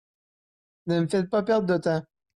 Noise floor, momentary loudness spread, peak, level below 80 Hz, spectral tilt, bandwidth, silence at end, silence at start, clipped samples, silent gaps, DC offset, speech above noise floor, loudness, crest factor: under -90 dBFS; 6 LU; -14 dBFS; -64 dBFS; -7 dB/octave; 11.5 kHz; 0.35 s; 0.85 s; under 0.1%; none; under 0.1%; over 66 dB; -25 LUFS; 14 dB